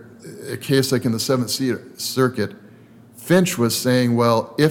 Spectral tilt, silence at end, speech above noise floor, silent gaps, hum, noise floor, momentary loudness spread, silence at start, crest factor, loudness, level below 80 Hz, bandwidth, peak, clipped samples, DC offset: -5 dB/octave; 0 s; 27 dB; none; none; -46 dBFS; 14 LU; 0 s; 14 dB; -20 LUFS; -62 dBFS; 19 kHz; -6 dBFS; under 0.1%; under 0.1%